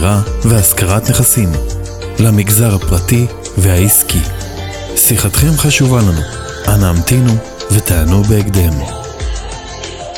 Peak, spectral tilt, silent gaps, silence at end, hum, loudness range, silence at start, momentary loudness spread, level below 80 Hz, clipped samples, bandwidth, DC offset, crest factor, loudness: 0 dBFS; -4.5 dB/octave; none; 0 s; none; 2 LU; 0 s; 14 LU; -22 dBFS; under 0.1%; 18 kHz; under 0.1%; 12 dB; -11 LUFS